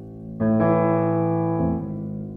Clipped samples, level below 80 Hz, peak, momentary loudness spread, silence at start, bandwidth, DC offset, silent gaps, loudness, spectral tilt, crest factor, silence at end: under 0.1%; -46 dBFS; -8 dBFS; 11 LU; 0 s; 3.4 kHz; under 0.1%; none; -22 LUFS; -13 dB/octave; 14 dB; 0 s